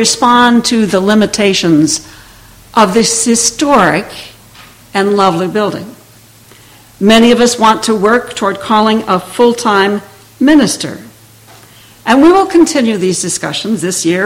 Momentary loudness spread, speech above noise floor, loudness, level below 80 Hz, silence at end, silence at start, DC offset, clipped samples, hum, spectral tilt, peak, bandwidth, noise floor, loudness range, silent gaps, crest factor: 10 LU; 31 dB; -10 LUFS; -44 dBFS; 0 s; 0 s; under 0.1%; 0.2%; none; -3.5 dB/octave; 0 dBFS; 16.5 kHz; -40 dBFS; 3 LU; none; 10 dB